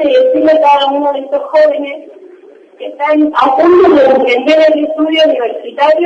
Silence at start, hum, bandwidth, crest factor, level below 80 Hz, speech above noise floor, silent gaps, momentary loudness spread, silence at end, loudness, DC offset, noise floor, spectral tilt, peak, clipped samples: 0 s; none; 7.6 kHz; 10 dB; -54 dBFS; 29 dB; none; 12 LU; 0 s; -9 LUFS; under 0.1%; -38 dBFS; -4.5 dB/octave; 0 dBFS; under 0.1%